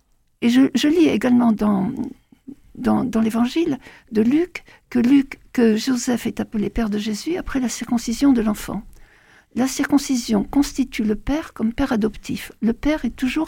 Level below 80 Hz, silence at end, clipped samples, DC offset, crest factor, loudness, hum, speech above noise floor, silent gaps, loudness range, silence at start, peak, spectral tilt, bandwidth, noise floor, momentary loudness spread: -40 dBFS; 0 s; under 0.1%; under 0.1%; 16 dB; -20 LUFS; none; 31 dB; none; 3 LU; 0.4 s; -4 dBFS; -5 dB/octave; 17 kHz; -51 dBFS; 9 LU